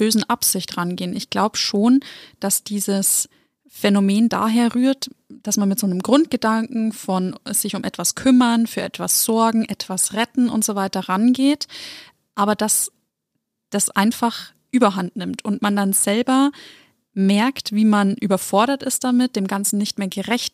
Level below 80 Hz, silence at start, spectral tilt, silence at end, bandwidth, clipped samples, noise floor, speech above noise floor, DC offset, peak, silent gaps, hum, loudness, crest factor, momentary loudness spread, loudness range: -64 dBFS; 0 s; -4 dB/octave; 0.05 s; 15.5 kHz; under 0.1%; -77 dBFS; 58 dB; under 0.1%; -2 dBFS; none; none; -19 LUFS; 18 dB; 9 LU; 2 LU